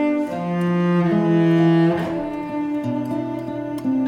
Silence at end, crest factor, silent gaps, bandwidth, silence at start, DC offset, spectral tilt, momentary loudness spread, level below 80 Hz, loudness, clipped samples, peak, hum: 0 s; 12 dB; none; 6.6 kHz; 0 s; under 0.1%; -9 dB/octave; 10 LU; -54 dBFS; -20 LUFS; under 0.1%; -6 dBFS; none